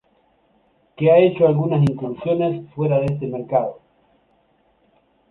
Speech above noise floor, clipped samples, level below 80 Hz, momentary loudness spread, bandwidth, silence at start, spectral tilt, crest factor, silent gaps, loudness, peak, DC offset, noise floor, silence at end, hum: 43 dB; under 0.1%; -54 dBFS; 10 LU; 4.6 kHz; 1 s; -10 dB/octave; 18 dB; none; -19 LUFS; -4 dBFS; under 0.1%; -61 dBFS; 1.55 s; none